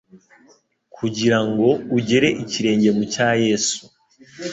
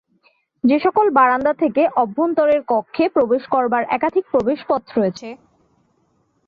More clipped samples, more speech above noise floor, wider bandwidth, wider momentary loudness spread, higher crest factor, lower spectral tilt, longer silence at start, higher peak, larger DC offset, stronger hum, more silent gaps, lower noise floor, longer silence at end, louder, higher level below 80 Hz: neither; second, 26 dB vs 46 dB; first, 8.2 kHz vs 7 kHz; first, 9 LU vs 6 LU; about the same, 18 dB vs 16 dB; second, -4.5 dB/octave vs -7 dB/octave; second, 0.15 s vs 0.65 s; about the same, -4 dBFS vs -4 dBFS; neither; neither; neither; second, -45 dBFS vs -63 dBFS; second, 0 s vs 1.1 s; about the same, -19 LUFS vs -18 LUFS; about the same, -58 dBFS vs -58 dBFS